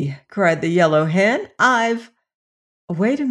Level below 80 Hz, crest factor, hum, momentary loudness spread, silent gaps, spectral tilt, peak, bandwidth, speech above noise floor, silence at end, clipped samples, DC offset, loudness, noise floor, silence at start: -66 dBFS; 16 dB; none; 9 LU; 2.34-2.88 s; -6 dB/octave; -4 dBFS; 11 kHz; over 72 dB; 0 s; under 0.1%; under 0.1%; -18 LUFS; under -90 dBFS; 0 s